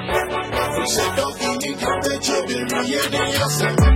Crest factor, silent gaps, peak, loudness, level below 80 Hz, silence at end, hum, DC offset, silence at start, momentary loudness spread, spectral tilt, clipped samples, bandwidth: 16 dB; none; -4 dBFS; -20 LUFS; -28 dBFS; 0 s; none; under 0.1%; 0 s; 4 LU; -4 dB/octave; under 0.1%; 16.5 kHz